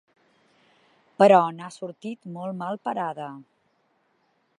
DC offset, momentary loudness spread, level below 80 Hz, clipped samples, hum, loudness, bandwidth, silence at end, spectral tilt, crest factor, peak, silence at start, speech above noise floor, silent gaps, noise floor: under 0.1%; 20 LU; -82 dBFS; under 0.1%; none; -23 LUFS; 11 kHz; 1.15 s; -6.5 dB/octave; 22 dB; -4 dBFS; 1.2 s; 45 dB; none; -69 dBFS